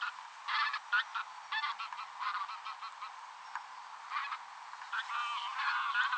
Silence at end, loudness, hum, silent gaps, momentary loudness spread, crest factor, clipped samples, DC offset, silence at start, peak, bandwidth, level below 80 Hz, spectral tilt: 0 s; -38 LUFS; none; none; 13 LU; 20 dB; under 0.1%; under 0.1%; 0 s; -20 dBFS; 9.4 kHz; under -90 dBFS; 3.5 dB/octave